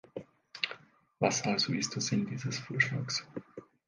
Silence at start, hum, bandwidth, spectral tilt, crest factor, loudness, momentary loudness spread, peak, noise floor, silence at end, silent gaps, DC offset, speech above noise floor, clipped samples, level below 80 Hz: 0.15 s; none; 10.5 kHz; -3.5 dB/octave; 22 dB; -32 LUFS; 18 LU; -12 dBFS; -52 dBFS; 0.25 s; none; under 0.1%; 20 dB; under 0.1%; -72 dBFS